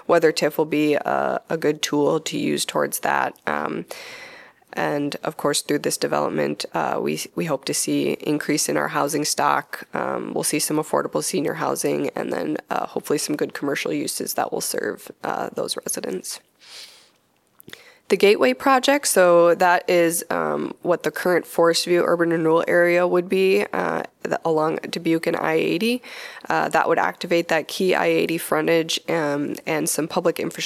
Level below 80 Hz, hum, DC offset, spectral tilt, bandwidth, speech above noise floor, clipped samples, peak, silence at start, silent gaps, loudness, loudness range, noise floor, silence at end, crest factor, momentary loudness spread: -70 dBFS; none; under 0.1%; -3.5 dB/octave; 15.5 kHz; 41 dB; under 0.1%; -4 dBFS; 0.1 s; none; -21 LUFS; 7 LU; -63 dBFS; 0 s; 18 dB; 9 LU